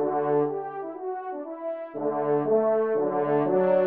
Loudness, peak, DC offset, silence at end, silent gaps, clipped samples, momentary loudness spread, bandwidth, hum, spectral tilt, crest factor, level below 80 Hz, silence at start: -26 LUFS; -12 dBFS; under 0.1%; 0 s; none; under 0.1%; 11 LU; 3.7 kHz; none; -7.5 dB/octave; 14 dB; -80 dBFS; 0 s